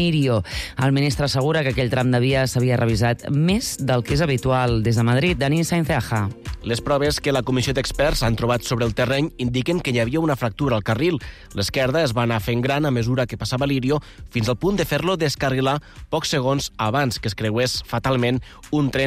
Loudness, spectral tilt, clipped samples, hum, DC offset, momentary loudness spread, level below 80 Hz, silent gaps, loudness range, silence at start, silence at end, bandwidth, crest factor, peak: -21 LUFS; -5.5 dB/octave; under 0.1%; none; under 0.1%; 5 LU; -38 dBFS; none; 2 LU; 0 s; 0 s; 15.5 kHz; 12 dB; -10 dBFS